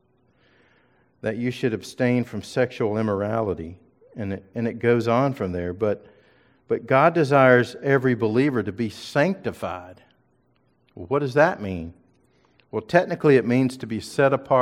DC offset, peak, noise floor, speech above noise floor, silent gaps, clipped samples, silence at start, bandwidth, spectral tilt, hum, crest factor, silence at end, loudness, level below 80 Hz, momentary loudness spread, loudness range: under 0.1%; -2 dBFS; -65 dBFS; 43 dB; none; under 0.1%; 1.25 s; 14.5 kHz; -7 dB/octave; none; 20 dB; 0 s; -22 LUFS; -58 dBFS; 14 LU; 6 LU